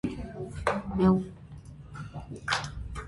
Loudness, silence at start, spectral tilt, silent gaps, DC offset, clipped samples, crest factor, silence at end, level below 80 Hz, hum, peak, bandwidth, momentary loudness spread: -30 LUFS; 0.05 s; -6 dB/octave; none; under 0.1%; under 0.1%; 20 dB; 0 s; -46 dBFS; none; -10 dBFS; 11.5 kHz; 21 LU